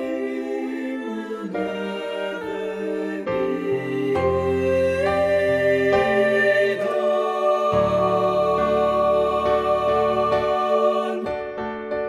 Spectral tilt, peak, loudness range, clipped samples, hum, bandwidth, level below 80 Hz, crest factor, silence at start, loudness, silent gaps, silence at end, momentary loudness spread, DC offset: -6.5 dB/octave; -6 dBFS; 7 LU; under 0.1%; none; 12 kHz; -48 dBFS; 14 dB; 0 s; -21 LUFS; none; 0 s; 9 LU; under 0.1%